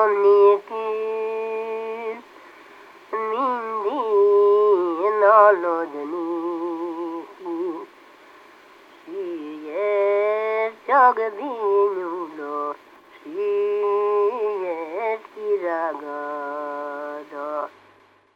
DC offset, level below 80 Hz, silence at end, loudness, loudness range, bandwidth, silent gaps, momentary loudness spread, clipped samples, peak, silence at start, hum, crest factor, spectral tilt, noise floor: under 0.1%; -80 dBFS; 0.65 s; -22 LUFS; 10 LU; 5.4 kHz; none; 15 LU; under 0.1%; -2 dBFS; 0 s; none; 20 dB; -5.5 dB/octave; -55 dBFS